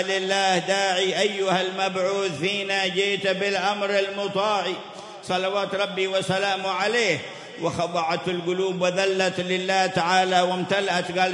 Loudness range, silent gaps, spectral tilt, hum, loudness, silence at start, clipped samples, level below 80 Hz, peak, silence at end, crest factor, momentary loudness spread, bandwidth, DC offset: 2 LU; none; -3.5 dB/octave; none; -23 LUFS; 0 s; under 0.1%; -70 dBFS; -8 dBFS; 0 s; 16 dB; 5 LU; 11.5 kHz; under 0.1%